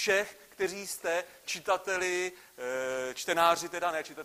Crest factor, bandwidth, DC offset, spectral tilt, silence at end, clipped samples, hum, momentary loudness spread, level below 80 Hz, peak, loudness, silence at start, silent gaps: 22 dB; 15.5 kHz; under 0.1%; -2 dB/octave; 0 s; under 0.1%; none; 10 LU; -70 dBFS; -10 dBFS; -31 LUFS; 0 s; none